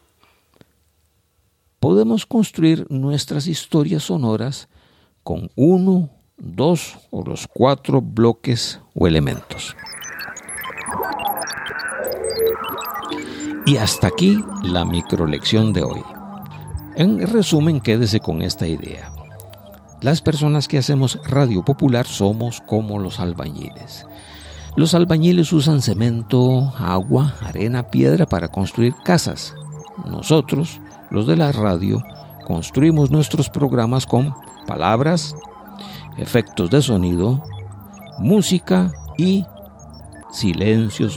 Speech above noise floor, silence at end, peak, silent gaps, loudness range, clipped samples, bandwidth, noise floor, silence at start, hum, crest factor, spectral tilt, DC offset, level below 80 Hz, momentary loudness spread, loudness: 46 dB; 0 s; 0 dBFS; none; 4 LU; under 0.1%; 17 kHz; -63 dBFS; 1.8 s; none; 18 dB; -6 dB/octave; under 0.1%; -42 dBFS; 17 LU; -19 LUFS